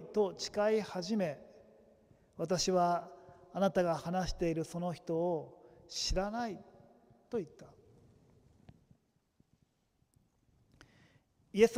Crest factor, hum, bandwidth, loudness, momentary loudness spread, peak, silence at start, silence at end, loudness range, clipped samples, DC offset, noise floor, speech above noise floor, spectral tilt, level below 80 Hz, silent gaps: 24 dB; none; 16 kHz; -35 LUFS; 17 LU; -14 dBFS; 0 s; 0 s; 15 LU; under 0.1%; under 0.1%; -76 dBFS; 42 dB; -5 dB/octave; -54 dBFS; none